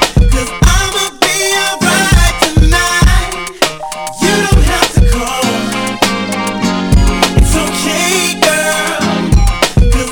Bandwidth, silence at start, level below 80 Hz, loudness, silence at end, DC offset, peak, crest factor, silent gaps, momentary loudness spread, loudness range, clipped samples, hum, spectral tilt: 19.5 kHz; 0 s; -14 dBFS; -11 LUFS; 0 s; under 0.1%; 0 dBFS; 10 dB; none; 5 LU; 2 LU; 0.5%; none; -4 dB/octave